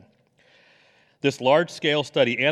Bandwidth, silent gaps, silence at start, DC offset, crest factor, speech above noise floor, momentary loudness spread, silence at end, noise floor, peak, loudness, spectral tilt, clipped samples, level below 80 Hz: 12.5 kHz; none; 1.25 s; under 0.1%; 18 dB; 39 dB; 6 LU; 0 s; -60 dBFS; -6 dBFS; -22 LUFS; -5 dB/octave; under 0.1%; -74 dBFS